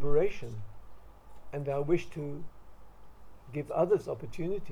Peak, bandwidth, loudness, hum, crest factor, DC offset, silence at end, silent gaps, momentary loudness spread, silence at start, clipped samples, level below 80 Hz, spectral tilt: -14 dBFS; 10 kHz; -33 LUFS; none; 18 dB; under 0.1%; 0 s; none; 18 LU; 0 s; under 0.1%; -48 dBFS; -8 dB/octave